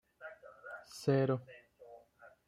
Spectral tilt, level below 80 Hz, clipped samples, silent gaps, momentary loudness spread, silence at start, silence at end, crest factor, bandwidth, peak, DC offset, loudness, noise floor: -7 dB/octave; -76 dBFS; under 0.1%; none; 25 LU; 0.2 s; 0.2 s; 20 dB; 14.5 kHz; -18 dBFS; under 0.1%; -35 LUFS; -62 dBFS